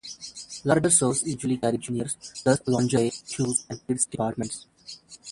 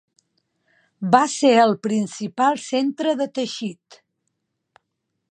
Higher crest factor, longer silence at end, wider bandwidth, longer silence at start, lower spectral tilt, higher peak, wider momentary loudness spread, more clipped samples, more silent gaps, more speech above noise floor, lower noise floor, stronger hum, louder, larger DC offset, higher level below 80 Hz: about the same, 20 dB vs 22 dB; second, 0 s vs 1.6 s; first, 11.5 kHz vs 10 kHz; second, 0.05 s vs 1 s; about the same, -4.5 dB/octave vs -4.5 dB/octave; second, -6 dBFS vs -2 dBFS; first, 18 LU vs 13 LU; neither; neither; second, 21 dB vs 57 dB; second, -46 dBFS vs -77 dBFS; neither; second, -25 LUFS vs -20 LUFS; neither; first, -58 dBFS vs -76 dBFS